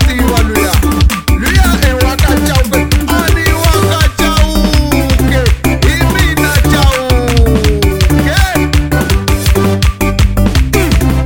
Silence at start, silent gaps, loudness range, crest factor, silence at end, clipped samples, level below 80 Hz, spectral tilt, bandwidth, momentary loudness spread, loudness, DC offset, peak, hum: 0 s; none; 1 LU; 8 dB; 0 s; 0.5%; -12 dBFS; -5 dB/octave; over 20 kHz; 2 LU; -10 LUFS; under 0.1%; 0 dBFS; none